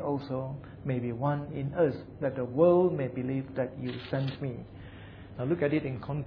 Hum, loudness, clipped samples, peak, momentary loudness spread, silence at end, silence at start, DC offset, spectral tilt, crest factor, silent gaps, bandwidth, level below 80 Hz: none; -31 LUFS; under 0.1%; -10 dBFS; 15 LU; 0 s; 0 s; under 0.1%; -10.5 dB/octave; 20 dB; none; 5.4 kHz; -56 dBFS